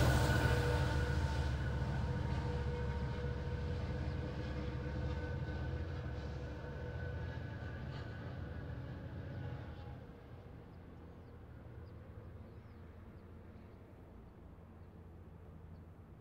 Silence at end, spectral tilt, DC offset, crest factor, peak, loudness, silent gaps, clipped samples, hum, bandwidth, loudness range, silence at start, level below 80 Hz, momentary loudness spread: 0 s; -6.5 dB/octave; under 0.1%; 20 dB; -20 dBFS; -40 LUFS; none; under 0.1%; none; 16 kHz; 17 LU; 0 s; -46 dBFS; 20 LU